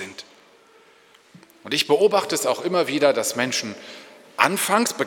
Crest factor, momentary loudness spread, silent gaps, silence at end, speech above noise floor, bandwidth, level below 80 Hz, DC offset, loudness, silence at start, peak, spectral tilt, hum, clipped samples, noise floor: 22 dB; 19 LU; none; 0 s; 33 dB; 19 kHz; -74 dBFS; under 0.1%; -21 LUFS; 0 s; -2 dBFS; -2.5 dB/octave; none; under 0.1%; -54 dBFS